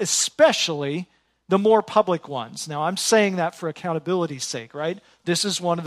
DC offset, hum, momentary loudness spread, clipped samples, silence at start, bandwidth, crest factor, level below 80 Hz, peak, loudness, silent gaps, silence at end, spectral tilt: under 0.1%; none; 12 LU; under 0.1%; 0 s; 14 kHz; 20 dB; -72 dBFS; -4 dBFS; -22 LUFS; none; 0 s; -3.5 dB/octave